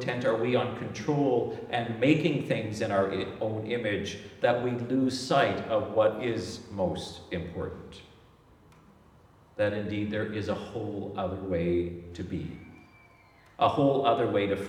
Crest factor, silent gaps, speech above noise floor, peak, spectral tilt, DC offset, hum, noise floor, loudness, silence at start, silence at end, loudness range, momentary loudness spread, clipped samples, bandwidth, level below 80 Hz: 20 dB; none; 29 dB; -10 dBFS; -6.5 dB/octave; under 0.1%; none; -58 dBFS; -29 LUFS; 0 s; 0 s; 7 LU; 12 LU; under 0.1%; 12.5 kHz; -58 dBFS